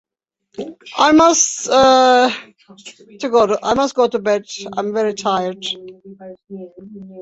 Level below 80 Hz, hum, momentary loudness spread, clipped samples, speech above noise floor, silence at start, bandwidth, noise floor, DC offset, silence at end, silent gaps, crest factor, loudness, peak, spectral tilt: -54 dBFS; none; 24 LU; under 0.1%; 46 dB; 0.6 s; 8.2 kHz; -63 dBFS; under 0.1%; 0 s; none; 16 dB; -15 LUFS; -2 dBFS; -2.5 dB/octave